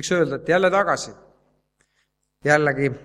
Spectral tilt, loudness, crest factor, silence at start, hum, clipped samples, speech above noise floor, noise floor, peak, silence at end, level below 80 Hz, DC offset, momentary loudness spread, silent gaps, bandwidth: -5 dB/octave; -20 LUFS; 22 dB; 0 s; none; under 0.1%; 50 dB; -71 dBFS; 0 dBFS; 0.05 s; -58 dBFS; under 0.1%; 9 LU; none; 12.5 kHz